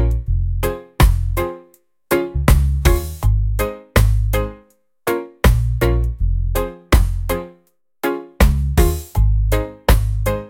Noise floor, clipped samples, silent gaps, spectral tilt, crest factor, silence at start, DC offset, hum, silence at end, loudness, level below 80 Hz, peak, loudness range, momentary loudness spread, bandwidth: -57 dBFS; under 0.1%; none; -6 dB/octave; 16 dB; 0 s; under 0.1%; none; 0 s; -19 LUFS; -18 dBFS; 0 dBFS; 1 LU; 8 LU; 17 kHz